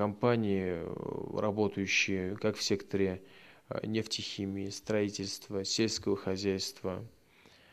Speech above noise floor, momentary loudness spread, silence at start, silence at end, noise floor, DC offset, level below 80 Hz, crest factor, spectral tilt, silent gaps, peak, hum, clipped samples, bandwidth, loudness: 28 dB; 10 LU; 0 s; 0.65 s; -61 dBFS; under 0.1%; -70 dBFS; 20 dB; -4.5 dB/octave; none; -14 dBFS; none; under 0.1%; 14.5 kHz; -33 LUFS